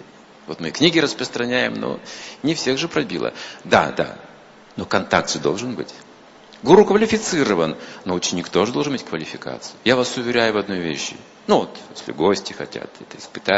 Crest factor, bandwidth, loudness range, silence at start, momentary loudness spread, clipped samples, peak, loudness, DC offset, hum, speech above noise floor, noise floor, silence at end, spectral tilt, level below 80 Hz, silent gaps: 20 dB; 8 kHz; 4 LU; 0 s; 17 LU; under 0.1%; 0 dBFS; -20 LUFS; under 0.1%; none; 25 dB; -45 dBFS; 0 s; -4 dB/octave; -56 dBFS; none